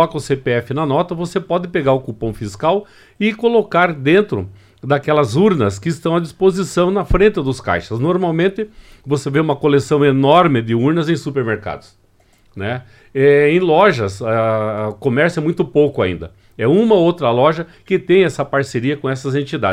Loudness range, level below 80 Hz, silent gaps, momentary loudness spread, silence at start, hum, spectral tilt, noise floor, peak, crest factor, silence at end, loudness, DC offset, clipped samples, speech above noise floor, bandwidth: 2 LU; -38 dBFS; none; 11 LU; 0 s; none; -6.5 dB/octave; -53 dBFS; 0 dBFS; 16 dB; 0 s; -16 LUFS; under 0.1%; under 0.1%; 37 dB; 13 kHz